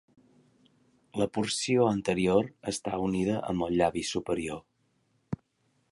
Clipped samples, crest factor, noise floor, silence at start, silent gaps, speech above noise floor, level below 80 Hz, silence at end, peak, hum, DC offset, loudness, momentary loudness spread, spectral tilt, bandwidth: under 0.1%; 20 dB; -73 dBFS; 1.15 s; none; 44 dB; -56 dBFS; 0.6 s; -10 dBFS; none; under 0.1%; -29 LUFS; 15 LU; -5 dB/octave; 11.5 kHz